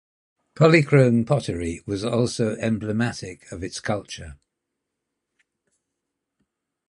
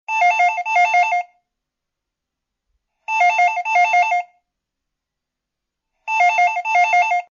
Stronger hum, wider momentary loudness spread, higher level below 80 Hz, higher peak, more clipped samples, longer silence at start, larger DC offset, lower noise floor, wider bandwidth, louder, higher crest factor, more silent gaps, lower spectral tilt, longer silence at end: neither; first, 18 LU vs 9 LU; first, -50 dBFS vs -76 dBFS; first, -2 dBFS vs -8 dBFS; neither; first, 0.6 s vs 0.1 s; neither; about the same, -82 dBFS vs -82 dBFS; first, 11 kHz vs 7.4 kHz; second, -22 LUFS vs -16 LUFS; first, 22 dB vs 12 dB; neither; first, -6.5 dB/octave vs 1 dB/octave; first, 2.55 s vs 0.05 s